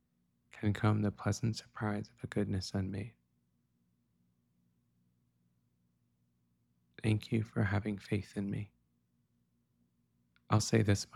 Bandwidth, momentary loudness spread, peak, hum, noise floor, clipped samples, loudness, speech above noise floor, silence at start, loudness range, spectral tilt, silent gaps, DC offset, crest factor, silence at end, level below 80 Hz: 12.5 kHz; 10 LU; -16 dBFS; 60 Hz at -70 dBFS; -77 dBFS; under 0.1%; -35 LUFS; 43 dB; 0.55 s; 7 LU; -6 dB/octave; none; under 0.1%; 22 dB; 0.1 s; -64 dBFS